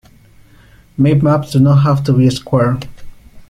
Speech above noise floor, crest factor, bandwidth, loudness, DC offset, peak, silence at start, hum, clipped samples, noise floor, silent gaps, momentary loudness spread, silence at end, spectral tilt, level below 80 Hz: 33 dB; 14 dB; 11.5 kHz; -13 LUFS; under 0.1%; 0 dBFS; 1 s; none; under 0.1%; -44 dBFS; none; 11 LU; 0.05 s; -8 dB/octave; -40 dBFS